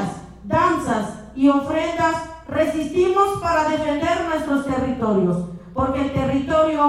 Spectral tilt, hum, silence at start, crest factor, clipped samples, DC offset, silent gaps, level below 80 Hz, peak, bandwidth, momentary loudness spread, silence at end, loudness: -6.5 dB/octave; none; 0 s; 14 dB; under 0.1%; under 0.1%; none; -42 dBFS; -6 dBFS; 14 kHz; 8 LU; 0 s; -21 LUFS